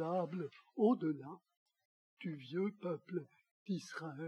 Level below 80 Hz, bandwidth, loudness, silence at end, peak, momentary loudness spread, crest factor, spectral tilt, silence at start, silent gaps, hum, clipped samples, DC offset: under -90 dBFS; 11.5 kHz; -40 LUFS; 0 s; -22 dBFS; 15 LU; 18 dB; -7.5 dB/octave; 0 s; 1.57-1.66 s, 1.85-2.17 s, 3.51-3.66 s; none; under 0.1%; under 0.1%